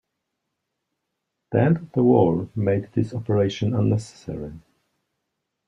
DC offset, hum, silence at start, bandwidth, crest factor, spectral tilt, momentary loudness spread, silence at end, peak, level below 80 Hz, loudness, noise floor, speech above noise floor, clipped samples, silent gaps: under 0.1%; none; 1.5 s; 10 kHz; 20 dB; -8.5 dB/octave; 15 LU; 1.1 s; -4 dBFS; -56 dBFS; -22 LUFS; -80 dBFS; 58 dB; under 0.1%; none